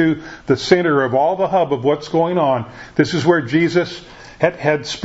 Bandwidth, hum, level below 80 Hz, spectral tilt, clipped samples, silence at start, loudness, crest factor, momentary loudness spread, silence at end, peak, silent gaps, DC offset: 8 kHz; none; -50 dBFS; -6 dB/octave; under 0.1%; 0 s; -17 LUFS; 16 dB; 7 LU; 0 s; 0 dBFS; none; under 0.1%